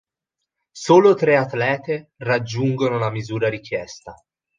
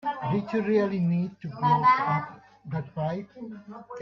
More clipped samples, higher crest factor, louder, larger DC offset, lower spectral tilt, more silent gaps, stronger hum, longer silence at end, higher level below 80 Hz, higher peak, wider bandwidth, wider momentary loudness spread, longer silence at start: neither; about the same, 18 dB vs 16 dB; first, -19 LUFS vs -26 LUFS; neither; second, -6.5 dB/octave vs -8.5 dB/octave; neither; neither; first, 0.45 s vs 0 s; first, -60 dBFS vs -66 dBFS; first, -2 dBFS vs -10 dBFS; first, 9.4 kHz vs 6.2 kHz; second, 15 LU vs 20 LU; first, 0.75 s vs 0.05 s